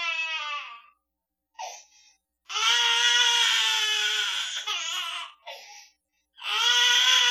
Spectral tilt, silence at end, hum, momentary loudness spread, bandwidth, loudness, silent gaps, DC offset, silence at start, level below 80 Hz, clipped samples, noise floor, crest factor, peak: 7 dB/octave; 0 s; none; 22 LU; 17 kHz; -22 LUFS; none; under 0.1%; 0 s; -88 dBFS; under 0.1%; -84 dBFS; 18 dB; -8 dBFS